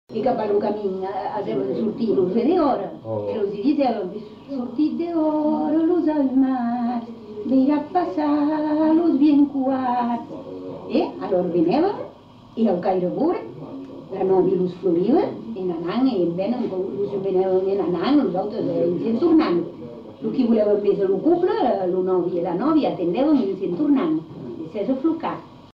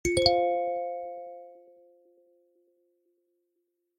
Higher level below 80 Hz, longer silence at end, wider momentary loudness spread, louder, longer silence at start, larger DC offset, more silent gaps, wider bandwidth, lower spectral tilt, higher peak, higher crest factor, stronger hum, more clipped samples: about the same, -58 dBFS vs -54 dBFS; second, 0.15 s vs 2.4 s; second, 12 LU vs 21 LU; first, -21 LUFS vs -27 LUFS; about the same, 0.1 s vs 0.05 s; neither; neither; second, 5.6 kHz vs 16.5 kHz; first, -9.5 dB/octave vs -3.5 dB/octave; about the same, -8 dBFS vs -6 dBFS; second, 12 dB vs 26 dB; neither; neither